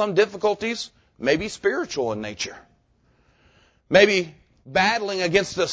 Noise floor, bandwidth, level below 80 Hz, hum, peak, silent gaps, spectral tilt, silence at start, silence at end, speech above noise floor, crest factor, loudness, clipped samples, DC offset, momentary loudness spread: -62 dBFS; 8 kHz; -54 dBFS; none; -2 dBFS; none; -4 dB/octave; 0 s; 0 s; 40 dB; 22 dB; -22 LUFS; under 0.1%; under 0.1%; 14 LU